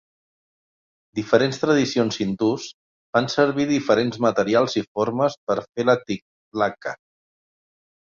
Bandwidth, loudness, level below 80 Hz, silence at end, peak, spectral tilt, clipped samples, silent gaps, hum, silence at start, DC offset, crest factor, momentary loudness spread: 7.6 kHz; -22 LUFS; -62 dBFS; 1.15 s; -4 dBFS; -5.5 dB/octave; under 0.1%; 2.74-3.13 s, 4.88-4.95 s, 5.37-5.47 s, 5.69-5.73 s, 6.22-6.51 s; none; 1.15 s; under 0.1%; 20 dB; 12 LU